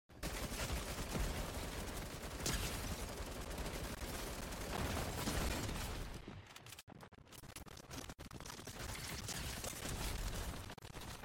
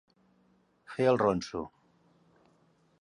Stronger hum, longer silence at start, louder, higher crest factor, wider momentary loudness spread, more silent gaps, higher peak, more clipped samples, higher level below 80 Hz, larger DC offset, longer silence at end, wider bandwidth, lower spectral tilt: neither; second, 0.1 s vs 0.9 s; second, -45 LUFS vs -30 LUFS; second, 16 dB vs 22 dB; second, 12 LU vs 18 LU; first, 6.83-6.87 s vs none; second, -28 dBFS vs -12 dBFS; neither; first, -50 dBFS vs -64 dBFS; neither; second, 0 s vs 1.35 s; first, 17 kHz vs 11 kHz; second, -3.5 dB/octave vs -6.5 dB/octave